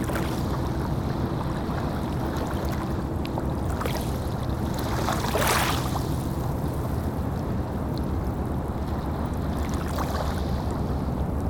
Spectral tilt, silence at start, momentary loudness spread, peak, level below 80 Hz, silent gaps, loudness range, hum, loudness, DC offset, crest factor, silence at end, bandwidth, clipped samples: -6 dB/octave; 0 s; 4 LU; -8 dBFS; -34 dBFS; none; 2 LU; none; -28 LUFS; under 0.1%; 20 dB; 0 s; over 20 kHz; under 0.1%